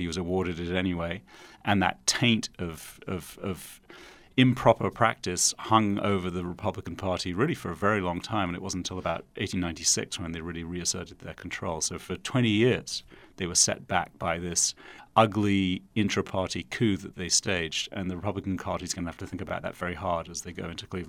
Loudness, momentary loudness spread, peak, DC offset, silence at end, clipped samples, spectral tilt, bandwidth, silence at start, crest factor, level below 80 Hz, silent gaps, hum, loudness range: -28 LUFS; 13 LU; -6 dBFS; under 0.1%; 0 s; under 0.1%; -3.5 dB/octave; 16.5 kHz; 0 s; 22 dB; -54 dBFS; none; none; 4 LU